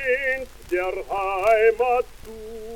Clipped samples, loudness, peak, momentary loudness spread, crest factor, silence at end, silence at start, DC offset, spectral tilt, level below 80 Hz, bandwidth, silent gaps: under 0.1%; -22 LUFS; -8 dBFS; 18 LU; 16 dB; 0 s; 0 s; under 0.1%; -4 dB/octave; -46 dBFS; 17.5 kHz; none